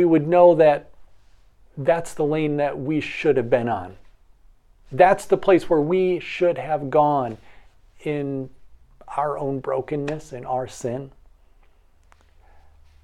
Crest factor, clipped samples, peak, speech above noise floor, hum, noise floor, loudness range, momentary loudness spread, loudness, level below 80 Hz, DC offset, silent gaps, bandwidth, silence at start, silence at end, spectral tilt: 22 dB; under 0.1%; 0 dBFS; 34 dB; none; -54 dBFS; 8 LU; 15 LU; -21 LUFS; -52 dBFS; under 0.1%; none; 12.5 kHz; 0 s; 1.95 s; -7 dB/octave